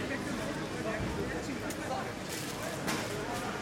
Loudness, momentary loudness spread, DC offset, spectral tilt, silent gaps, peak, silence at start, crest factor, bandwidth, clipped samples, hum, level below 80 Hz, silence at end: -36 LUFS; 3 LU; under 0.1%; -4 dB/octave; none; -20 dBFS; 0 s; 16 dB; 16.5 kHz; under 0.1%; none; -52 dBFS; 0 s